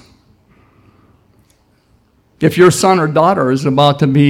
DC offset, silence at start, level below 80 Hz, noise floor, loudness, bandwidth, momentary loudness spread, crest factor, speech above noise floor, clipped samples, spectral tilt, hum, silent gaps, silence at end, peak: under 0.1%; 2.4 s; -52 dBFS; -54 dBFS; -11 LUFS; 16.5 kHz; 5 LU; 14 dB; 44 dB; under 0.1%; -6 dB/octave; none; none; 0 s; 0 dBFS